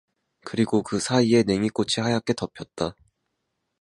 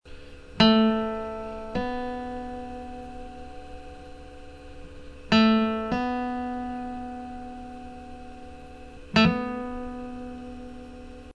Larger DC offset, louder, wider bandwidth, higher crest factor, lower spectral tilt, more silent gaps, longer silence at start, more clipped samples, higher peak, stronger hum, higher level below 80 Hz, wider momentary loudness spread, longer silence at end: neither; about the same, -24 LUFS vs -26 LUFS; first, 11.5 kHz vs 9.4 kHz; about the same, 20 dB vs 22 dB; about the same, -5 dB/octave vs -6 dB/octave; neither; first, 0.45 s vs 0.05 s; neither; about the same, -6 dBFS vs -6 dBFS; neither; second, -56 dBFS vs -46 dBFS; second, 12 LU vs 25 LU; first, 0.9 s vs 0.05 s